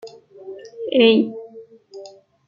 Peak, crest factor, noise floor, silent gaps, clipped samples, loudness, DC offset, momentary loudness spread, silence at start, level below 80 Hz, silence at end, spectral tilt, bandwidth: -2 dBFS; 20 dB; -43 dBFS; none; under 0.1%; -17 LUFS; under 0.1%; 26 LU; 0.05 s; -70 dBFS; 0.4 s; -6 dB/octave; 7.2 kHz